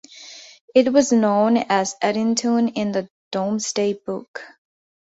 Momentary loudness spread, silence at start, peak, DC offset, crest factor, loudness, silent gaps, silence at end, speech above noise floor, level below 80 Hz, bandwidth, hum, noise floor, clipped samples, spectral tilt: 21 LU; 0.15 s; -4 dBFS; under 0.1%; 18 dB; -20 LUFS; 0.61-0.68 s, 3.10-3.31 s, 4.28-4.34 s; 0.65 s; 23 dB; -64 dBFS; 8 kHz; none; -42 dBFS; under 0.1%; -4.5 dB/octave